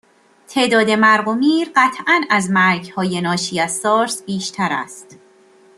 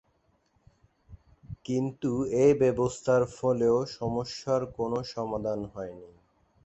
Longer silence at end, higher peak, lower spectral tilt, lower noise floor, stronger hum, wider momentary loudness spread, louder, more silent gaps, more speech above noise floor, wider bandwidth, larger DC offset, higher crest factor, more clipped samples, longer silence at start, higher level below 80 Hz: about the same, 0.65 s vs 0.6 s; first, -2 dBFS vs -10 dBFS; second, -4 dB/octave vs -6.5 dB/octave; second, -49 dBFS vs -70 dBFS; neither; second, 9 LU vs 15 LU; first, -16 LUFS vs -28 LUFS; neither; second, 33 dB vs 42 dB; first, 13 kHz vs 8.4 kHz; neither; about the same, 16 dB vs 18 dB; neither; second, 0.5 s vs 1.1 s; second, -64 dBFS vs -56 dBFS